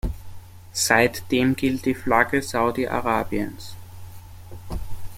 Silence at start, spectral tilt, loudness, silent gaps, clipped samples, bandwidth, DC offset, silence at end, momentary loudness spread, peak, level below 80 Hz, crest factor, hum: 0.05 s; -4 dB/octave; -22 LUFS; none; under 0.1%; 16.5 kHz; under 0.1%; 0 s; 23 LU; -2 dBFS; -40 dBFS; 22 dB; none